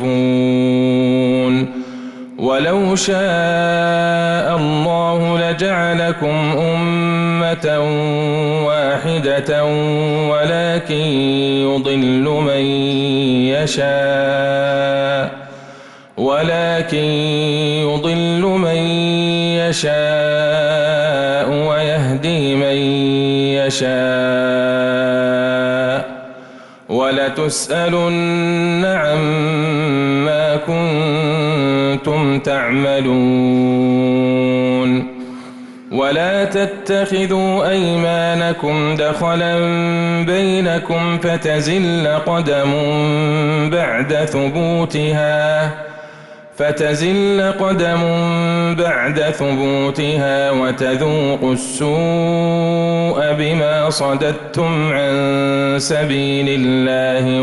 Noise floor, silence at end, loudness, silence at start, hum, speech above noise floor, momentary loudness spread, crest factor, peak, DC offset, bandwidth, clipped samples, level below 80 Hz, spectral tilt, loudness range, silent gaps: -38 dBFS; 0 s; -16 LUFS; 0 s; none; 23 dB; 3 LU; 10 dB; -6 dBFS; under 0.1%; 12 kHz; under 0.1%; -50 dBFS; -5.5 dB/octave; 2 LU; none